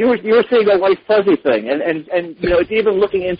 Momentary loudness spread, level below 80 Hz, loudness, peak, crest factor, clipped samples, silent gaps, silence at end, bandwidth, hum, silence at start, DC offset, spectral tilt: 6 LU; -42 dBFS; -15 LUFS; -2 dBFS; 12 dB; under 0.1%; none; 0.05 s; 5.2 kHz; none; 0 s; under 0.1%; -11 dB/octave